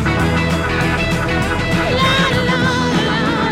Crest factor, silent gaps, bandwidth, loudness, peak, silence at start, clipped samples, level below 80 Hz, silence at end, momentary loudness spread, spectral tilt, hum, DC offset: 12 dB; none; 15.5 kHz; -15 LUFS; -4 dBFS; 0 s; under 0.1%; -28 dBFS; 0 s; 3 LU; -5.5 dB/octave; none; under 0.1%